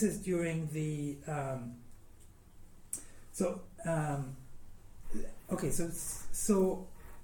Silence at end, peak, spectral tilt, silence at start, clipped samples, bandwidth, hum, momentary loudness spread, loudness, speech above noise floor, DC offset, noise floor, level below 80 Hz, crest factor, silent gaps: 0 s; -16 dBFS; -6 dB/octave; 0 s; under 0.1%; 17.5 kHz; none; 16 LU; -36 LUFS; 21 dB; under 0.1%; -55 dBFS; -50 dBFS; 20 dB; none